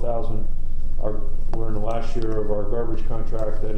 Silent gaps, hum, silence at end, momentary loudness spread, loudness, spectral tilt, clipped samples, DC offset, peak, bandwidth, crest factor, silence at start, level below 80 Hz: none; none; 0 s; 5 LU; -29 LUFS; -8.5 dB/octave; under 0.1%; under 0.1%; -8 dBFS; 2.4 kHz; 8 dB; 0 s; -20 dBFS